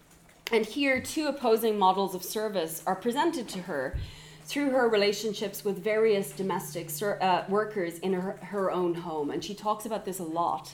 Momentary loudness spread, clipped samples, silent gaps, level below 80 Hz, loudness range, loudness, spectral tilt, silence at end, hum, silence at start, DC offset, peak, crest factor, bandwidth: 9 LU; under 0.1%; none; -54 dBFS; 2 LU; -29 LUFS; -4.5 dB/octave; 0 s; none; 0.45 s; under 0.1%; -12 dBFS; 18 dB; 18.5 kHz